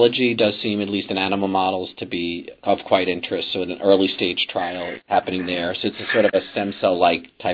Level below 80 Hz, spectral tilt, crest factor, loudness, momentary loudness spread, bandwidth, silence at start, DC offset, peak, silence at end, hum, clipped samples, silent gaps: -60 dBFS; -7.5 dB/octave; 20 dB; -21 LUFS; 9 LU; 5.2 kHz; 0 s; under 0.1%; -2 dBFS; 0 s; none; under 0.1%; none